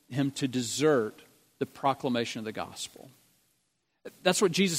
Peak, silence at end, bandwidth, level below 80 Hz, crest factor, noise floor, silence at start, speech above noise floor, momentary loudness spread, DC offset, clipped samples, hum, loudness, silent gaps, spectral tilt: -8 dBFS; 0 s; 16 kHz; -72 dBFS; 22 dB; -77 dBFS; 0.1 s; 48 dB; 14 LU; under 0.1%; under 0.1%; none; -30 LUFS; none; -4 dB/octave